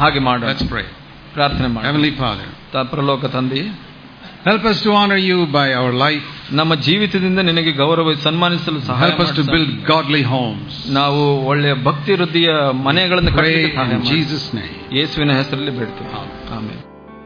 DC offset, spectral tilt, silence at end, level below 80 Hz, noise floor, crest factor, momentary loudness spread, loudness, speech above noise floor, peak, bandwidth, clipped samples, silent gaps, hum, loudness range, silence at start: under 0.1%; -7 dB/octave; 0 s; -38 dBFS; -37 dBFS; 16 dB; 12 LU; -16 LUFS; 21 dB; 0 dBFS; 5.2 kHz; under 0.1%; none; none; 4 LU; 0 s